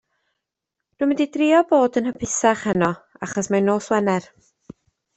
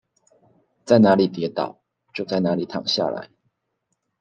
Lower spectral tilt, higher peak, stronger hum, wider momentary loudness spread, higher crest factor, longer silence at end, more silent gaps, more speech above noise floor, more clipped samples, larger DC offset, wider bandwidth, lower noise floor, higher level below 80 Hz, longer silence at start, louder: second, -5 dB/octave vs -6.5 dB/octave; about the same, -4 dBFS vs -2 dBFS; neither; second, 9 LU vs 17 LU; about the same, 18 dB vs 20 dB; about the same, 0.95 s vs 0.95 s; neither; first, 64 dB vs 56 dB; neither; neither; about the same, 8.4 kHz vs 9 kHz; first, -83 dBFS vs -75 dBFS; first, -58 dBFS vs -70 dBFS; first, 1 s vs 0.85 s; about the same, -20 LUFS vs -21 LUFS